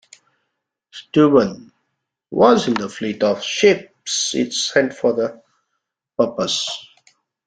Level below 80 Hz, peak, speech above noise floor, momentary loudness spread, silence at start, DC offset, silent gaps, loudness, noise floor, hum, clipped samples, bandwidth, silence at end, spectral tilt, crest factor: -62 dBFS; -2 dBFS; 59 dB; 13 LU; 0.95 s; under 0.1%; none; -18 LUFS; -77 dBFS; none; under 0.1%; 9.6 kHz; 0.65 s; -3.5 dB/octave; 18 dB